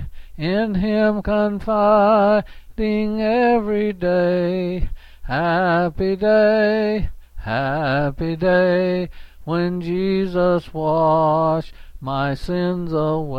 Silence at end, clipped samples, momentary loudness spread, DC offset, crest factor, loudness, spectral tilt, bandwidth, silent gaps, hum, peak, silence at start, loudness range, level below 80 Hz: 0 s; under 0.1%; 10 LU; under 0.1%; 14 dB; -19 LUFS; -8.5 dB/octave; 6.8 kHz; none; none; -6 dBFS; 0 s; 2 LU; -36 dBFS